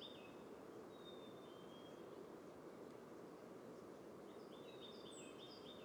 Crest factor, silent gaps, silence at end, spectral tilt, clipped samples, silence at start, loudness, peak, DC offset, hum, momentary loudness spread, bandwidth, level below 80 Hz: 12 dB; none; 0 s; -4.5 dB/octave; under 0.1%; 0 s; -57 LUFS; -44 dBFS; under 0.1%; none; 2 LU; over 20 kHz; -88 dBFS